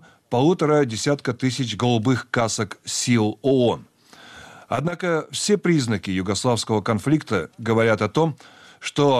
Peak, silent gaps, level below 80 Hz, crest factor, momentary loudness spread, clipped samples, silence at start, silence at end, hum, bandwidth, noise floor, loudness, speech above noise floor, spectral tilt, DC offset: -8 dBFS; none; -58 dBFS; 14 dB; 7 LU; under 0.1%; 0.3 s; 0 s; none; 14.5 kHz; -46 dBFS; -22 LUFS; 25 dB; -5 dB/octave; under 0.1%